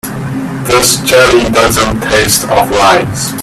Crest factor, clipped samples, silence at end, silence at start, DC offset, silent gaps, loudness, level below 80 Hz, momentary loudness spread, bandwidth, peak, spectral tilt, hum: 10 dB; 0.2%; 0 s; 0.05 s; under 0.1%; none; -9 LUFS; -30 dBFS; 11 LU; over 20 kHz; 0 dBFS; -3 dB/octave; none